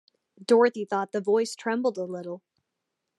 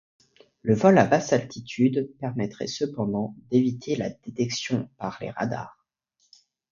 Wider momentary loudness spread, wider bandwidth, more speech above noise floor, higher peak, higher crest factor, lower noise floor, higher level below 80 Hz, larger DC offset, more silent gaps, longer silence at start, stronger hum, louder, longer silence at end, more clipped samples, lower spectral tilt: first, 18 LU vs 14 LU; first, 12 kHz vs 7.4 kHz; first, 57 dB vs 47 dB; second, -8 dBFS vs -4 dBFS; about the same, 20 dB vs 22 dB; first, -83 dBFS vs -71 dBFS; second, -90 dBFS vs -62 dBFS; neither; neither; second, 0.4 s vs 0.65 s; neither; about the same, -26 LUFS vs -25 LUFS; second, 0.8 s vs 1 s; neither; about the same, -5 dB/octave vs -6 dB/octave